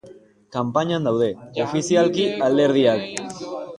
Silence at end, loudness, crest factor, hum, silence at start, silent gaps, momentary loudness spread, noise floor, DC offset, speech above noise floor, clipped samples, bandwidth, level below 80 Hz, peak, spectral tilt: 0 s; -21 LUFS; 18 dB; none; 0.05 s; none; 13 LU; -47 dBFS; under 0.1%; 27 dB; under 0.1%; 11.5 kHz; -62 dBFS; -4 dBFS; -5.5 dB/octave